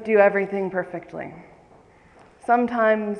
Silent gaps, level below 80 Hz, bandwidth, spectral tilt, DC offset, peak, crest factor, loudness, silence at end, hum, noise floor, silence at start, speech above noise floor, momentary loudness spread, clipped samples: none; -64 dBFS; 9.4 kHz; -7.5 dB/octave; under 0.1%; -4 dBFS; 18 dB; -22 LUFS; 0 s; none; -52 dBFS; 0 s; 31 dB; 18 LU; under 0.1%